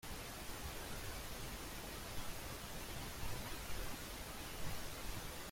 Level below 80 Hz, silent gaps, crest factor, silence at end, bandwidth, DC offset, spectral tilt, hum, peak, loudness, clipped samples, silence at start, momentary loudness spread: -52 dBFS; none; 16 dB; 0 s; 16.5 kHz; under 0.1%; -3 dB/octave; none; -30 dBFS; -47 LUFS; under 0.1%; 0.05 s; 1 LU